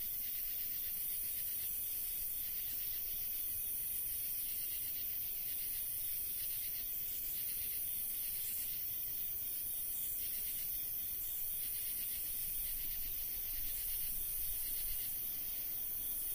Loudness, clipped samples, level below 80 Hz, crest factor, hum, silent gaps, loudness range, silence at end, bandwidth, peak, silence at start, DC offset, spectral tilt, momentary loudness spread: -37 LUFS; under 0.1%; -58 dBFS; 14 dB; none; none; 0 LU; 0 s; 16 kHz; -26 dBFS; 0 s; under 0.1%; 0 dB/octave; 1 LU